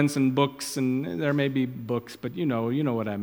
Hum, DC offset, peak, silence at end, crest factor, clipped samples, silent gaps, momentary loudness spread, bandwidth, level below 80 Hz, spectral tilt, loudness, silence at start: none; under 0.1%; -8 dBFS; 0 s; 18 dB; under 0.1%; none; 8 LU; 18.5 kHz; -66 dBFS; -6 dB/octave; -27 LUFS; 0 s